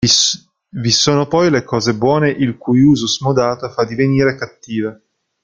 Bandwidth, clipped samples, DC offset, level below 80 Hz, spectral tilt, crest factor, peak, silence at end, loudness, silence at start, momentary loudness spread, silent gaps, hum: 9.4 kHz; under 0.1%; under 0.1%; -48 dBFS; -4.5 dB/octave; 14 dB; 0 dBFS; 0.5 s; -15 LUFS; 0 s; 11 LU; none; none